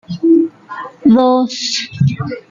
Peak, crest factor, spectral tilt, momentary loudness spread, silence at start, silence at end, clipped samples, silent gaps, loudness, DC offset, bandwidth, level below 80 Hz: -2 dBFS; 12 dB; -6 dB/octave; 13 LU; 0.1 s; 0.1 s; under 0.1%; none; -14 LUFS; under 0.1%; 7.6 kHz; -52 dBFS